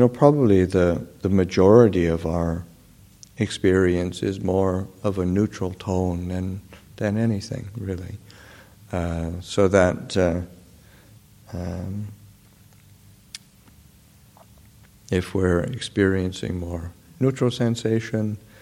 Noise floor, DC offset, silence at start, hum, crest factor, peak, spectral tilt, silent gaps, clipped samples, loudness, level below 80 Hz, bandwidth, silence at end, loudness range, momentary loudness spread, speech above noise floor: -52 dBFS; under 0.1%; 0 s; none; 22 dB; 0 dBFS; -7 dB/octave; none; under 0.1%; -22 LUFS; -46 dBFS; 16 kHz; 0.25 s; 17 LU; 15 LU; 31 dB